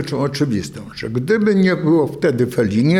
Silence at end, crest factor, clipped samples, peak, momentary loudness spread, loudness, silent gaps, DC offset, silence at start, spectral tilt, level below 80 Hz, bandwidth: 0 s; 10 dB; under 0.1%; -6 dBFS; 10 LU; -17 LUFS; none; under 0.1%; 0 s; -7 dB/octave; -52 dBFS; 14.5 kHz